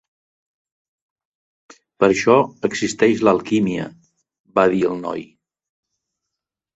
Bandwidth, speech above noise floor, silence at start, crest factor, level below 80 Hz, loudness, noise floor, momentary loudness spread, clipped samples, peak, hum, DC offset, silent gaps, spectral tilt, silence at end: 8.2 kHz; 66 dB; 2 s; 20 dB; -58 dBFS; -18 LUFS; -84 dBFS; 13 LU; under 0.1%; -2 dBFS; none; under 0.1%; 4.40-4.44 s; -5.5 dB/octave; 1.5 s